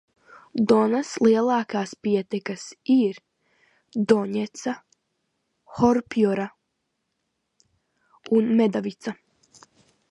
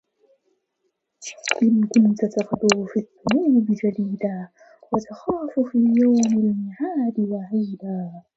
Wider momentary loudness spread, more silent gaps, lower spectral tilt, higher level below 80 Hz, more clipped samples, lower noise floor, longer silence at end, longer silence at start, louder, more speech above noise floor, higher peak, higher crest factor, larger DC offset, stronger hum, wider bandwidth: first, 15 LU vs 12 LU; neither; about the same, -6 dB/octave vs -5.5 dB/octave; about the same, -64 dBFS vs -62 dBFS; neither; about the same, -77 dBFS vs -74 dBFS; first, 0.95 s vs 0.15 s; second, 0.55 s vs 1.2 s; about the same, -23 LUFS vs -21 LUFS; about the same, 55 dB vs 53 dB; second, -4 dBFS vs 0 dBFS; about the same, 20 dB vs 22 dB; neither; neither; first, 9.4 kHz vs 8 kHz